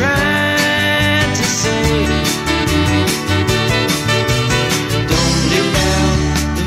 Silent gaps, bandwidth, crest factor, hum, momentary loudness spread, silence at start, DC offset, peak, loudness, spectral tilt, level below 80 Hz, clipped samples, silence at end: none; 16 kHz; 12 dB; none; 3 LU; 0 s; under 0.1%; -2 dBFS; -14 LUFS; -4 dB/octave; -26 dBFS; under 0.1%; 0 s